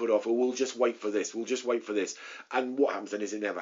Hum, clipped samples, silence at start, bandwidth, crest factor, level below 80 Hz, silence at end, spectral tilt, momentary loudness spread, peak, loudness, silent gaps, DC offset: none; under 0.1%; 0 s; 7.4 kHz; 18 dB; -82 dBFS; 0 s; -2.5 dB/octave; 6 LU; -12 dBFS; -30 LUFS; none; under 0.1%